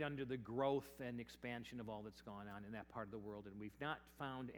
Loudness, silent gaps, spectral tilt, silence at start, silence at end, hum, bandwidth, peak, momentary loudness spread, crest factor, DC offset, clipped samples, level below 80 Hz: -48 LUFS; none; -6.5 dB/octave; 0 s; 0 s; none; over 20 kHz; -28 dBFS; 12 LU; 20 dB; under 0.1%; under 0.1%; -72 dBFS